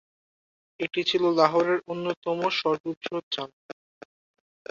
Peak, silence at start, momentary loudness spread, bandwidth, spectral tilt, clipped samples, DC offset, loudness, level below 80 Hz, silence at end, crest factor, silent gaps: -6 dBFS; 0.8 s; 22 LU; 7.4 kHz; -5 dB/octave; under 0.1%; under 0.1%; -26 LUFS; -74 dBFS; 1 s; 22 dB; 2.17-2.22 s, 2.80-2.84 s, 2.97-3.01 s, 3.23-3.31 s, 3.53-3.69 s